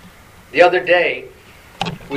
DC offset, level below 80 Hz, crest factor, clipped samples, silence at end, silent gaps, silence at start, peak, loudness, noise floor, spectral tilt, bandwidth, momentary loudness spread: under 0.1%; -50 dBFS; 18 dB; under 0.1%; 0 s; none; 0.55 s; 0 dBFS; -16 LUFS; -43 dBFS; -5 dB/octave; 12.5 kHz; 14 LU